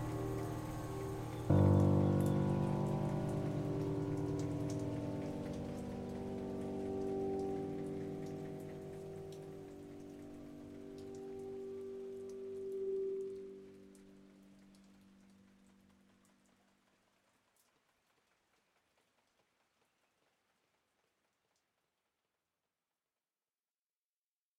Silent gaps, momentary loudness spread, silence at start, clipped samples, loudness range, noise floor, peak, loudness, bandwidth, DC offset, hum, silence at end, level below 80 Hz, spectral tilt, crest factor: none; 19 LU; 0 s; under 0.1%; 15 LU; under -90 dBFS; -18 dBFS; -39 LUFS; 15.5 kHz; under 0.1%; none; 9.5 s; -62 dBFS; -8.5 dB/octave; 24 dB